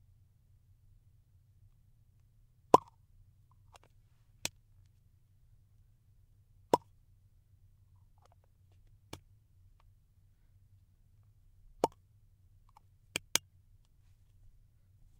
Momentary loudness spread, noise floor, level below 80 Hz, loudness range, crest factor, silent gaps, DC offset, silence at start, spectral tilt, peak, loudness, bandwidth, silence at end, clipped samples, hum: 25 LU; -66 dBFS; -66 dBFS; 13 LU; 36 dB; none; under 0.1%; 2.75 s; -3 dB/octave; -6 dBFS; -34 LUFS; 15.5 kHz; 1.8 s; under 0.1%; none